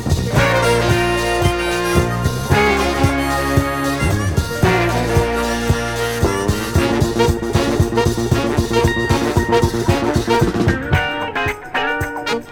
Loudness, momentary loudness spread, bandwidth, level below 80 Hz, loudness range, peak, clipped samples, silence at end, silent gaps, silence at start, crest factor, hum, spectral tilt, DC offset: -17 LUFS; 5 LU; 20 kHz; -28 dBFS; 1 LU; 0 dBFS; under 0.1%; 0 s; none; 0 s; 16 dB; none; -5.5 dB/octave; under 0.1%